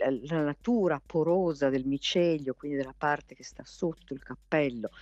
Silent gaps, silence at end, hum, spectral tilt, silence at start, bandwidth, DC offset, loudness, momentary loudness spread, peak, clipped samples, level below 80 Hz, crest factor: none; 0 s; none; -6 dB/octave; 0 s; 8.2 kHz; under 0.1%; -30 LUFS; 15 LU; -14 dBFS; under 0.1%; -60 dBFS; 16 dB